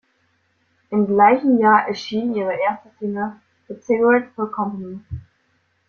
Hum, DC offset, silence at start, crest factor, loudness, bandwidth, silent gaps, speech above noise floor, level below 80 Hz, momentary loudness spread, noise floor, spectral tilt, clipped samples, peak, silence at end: none; under 0.1%; 0.9 s; 18 dB; -19 LUFS; 6.8 kHz; none; 47 dB; -54 dBFS; 19 LU; -65 dBFS; -7 dB/octave; under 0.1%; -2 dBFS; 0.7 s